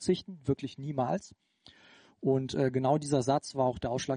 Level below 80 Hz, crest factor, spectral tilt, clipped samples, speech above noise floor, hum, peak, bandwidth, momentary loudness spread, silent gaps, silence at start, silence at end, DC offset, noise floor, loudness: -62 dBFS; 18 dB; -6 dB/octave; under 0.1%; 28 dB; none; -14 dBFS; 10 kHz; 6 LU; none; 0 s; 0 s; under 0.1%; -59 dBFS; -31 LUFS